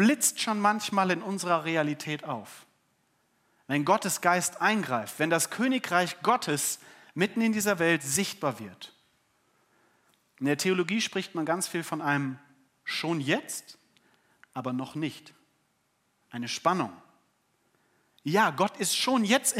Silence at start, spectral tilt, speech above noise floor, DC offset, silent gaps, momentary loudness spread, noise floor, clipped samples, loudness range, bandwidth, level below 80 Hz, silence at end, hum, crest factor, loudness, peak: 0 s; -3.5 dB/octave; 45 dB; under 0.1%; none; 13 LU; -73 dBFS; under 0.1%; 7 LU; 16 kHz; -78 dBFS; 0 s; none; 22 dB; -28 LUFS; -8 dBFS